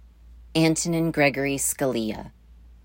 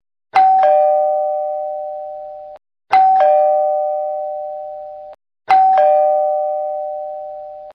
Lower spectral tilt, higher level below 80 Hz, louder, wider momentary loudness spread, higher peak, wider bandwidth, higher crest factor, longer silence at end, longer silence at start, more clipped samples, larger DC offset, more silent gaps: about the same, -4 dB/octave vs -4 dB/octave; first, -48 dBFS vs -64 dBFS; second, -23 LUFS vs -15 LUFS; second, 8 LU vs 19 LU; second, -8 dBFS vs -4 dBFS; first, 16.5 kHz vs 5.6 kHz; first, 18 dB vs 12 dB; about the same, 0.1 s vs 0.05 s; about the same, 0.25 s vs 0.35 s; neither; neither; neither